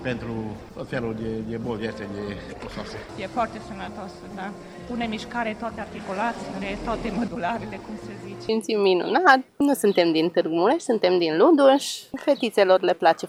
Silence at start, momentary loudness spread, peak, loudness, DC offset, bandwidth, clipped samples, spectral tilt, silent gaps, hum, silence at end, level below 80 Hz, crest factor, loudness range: 0 s; 17 LU; -2 dBFS; -23 LUFS; under 0.1%; 16 kHz; under 0.1%; -5 dB/octave; none; none; 0 s; -50 dBFS; 22 dB; 12 LU